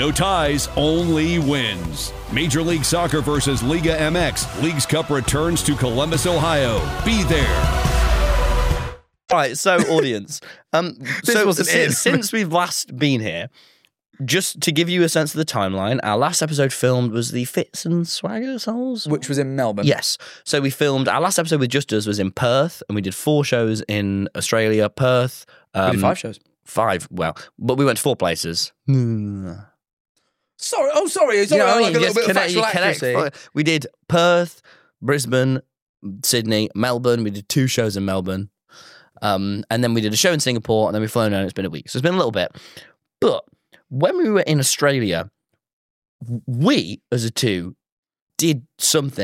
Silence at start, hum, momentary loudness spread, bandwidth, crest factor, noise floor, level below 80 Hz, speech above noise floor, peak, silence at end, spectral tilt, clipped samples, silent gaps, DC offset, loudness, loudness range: 0 s; none; 9 LU; 16.5 kHz; 16 dB; -47 dBFS; -32 dBFS; 27 dB; -4 dBFS; 0 s; -4.5 dB/octave; under 0.1%; 29.93-30.15 s, 35.82-35.94 s, 45.73-46.02 s, 46.08-46.19 s, 47.92-48.03 s, 48.22-48.27 s; under 0.1%; -19 LUFS; 4 LU